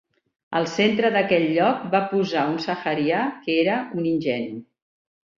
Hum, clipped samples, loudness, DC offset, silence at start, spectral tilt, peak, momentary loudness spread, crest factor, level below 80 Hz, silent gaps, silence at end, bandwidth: none; under 0.1%; -22 LUFS; under 0.1%; 0.5 s; -6 dB/octave; -6 dBFS; 7 LU; 18 dB; -64 dBFS; none; 0.75 s; 7.6 kHz